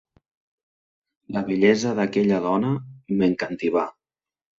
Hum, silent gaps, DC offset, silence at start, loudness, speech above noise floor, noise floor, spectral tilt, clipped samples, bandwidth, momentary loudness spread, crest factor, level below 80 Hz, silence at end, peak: none; none; under 0.1%; 1.3 s; -23 LUFS; over 69 dB; under -90 dBFS; -6.5 dB/octave; under 0.1%; 7.8 kHz; 10 LU; 18 dB; -62 dBFS; 0.7 s; -6 dBFS